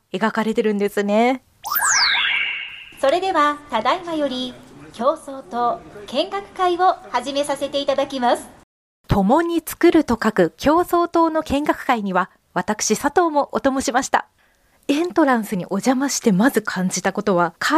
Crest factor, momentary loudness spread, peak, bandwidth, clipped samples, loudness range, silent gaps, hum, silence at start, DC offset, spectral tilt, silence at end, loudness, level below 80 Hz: 16 dB; 8 LU; -4 dBFS; 15.5 kHz; under 0.1%; 4 LU; 8.63-9.04 s; none; 0.15 s; under 0.1%; -4 dB/octave; 0 s; -19 LUFS; -46 dBFS